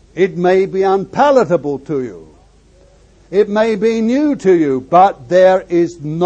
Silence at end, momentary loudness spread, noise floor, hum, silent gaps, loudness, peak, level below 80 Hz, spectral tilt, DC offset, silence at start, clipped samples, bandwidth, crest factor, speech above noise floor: 0 s; 8 LU; -47 dBFS; none; none; -13 LUFS; 0 dBFS; -48 dBFS; -7 dB/octave; under 0.1%; 0.15 s; under 0.1%; 8.4 kHz; 14 dB; 34 dB